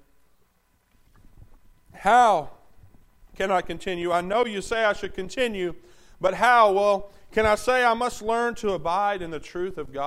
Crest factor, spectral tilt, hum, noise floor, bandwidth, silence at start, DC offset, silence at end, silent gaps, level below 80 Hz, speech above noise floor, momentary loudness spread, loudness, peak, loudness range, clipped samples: 18 dB; -4 dB/octave; none; -66 dBFS; 15 kHz; 1.4 s; under 0.1%; 0 s; none; -48 dBFS; 43 dB; 14 LU; -23 LUFS; -6 dBFS; 5 LU; under 0.1%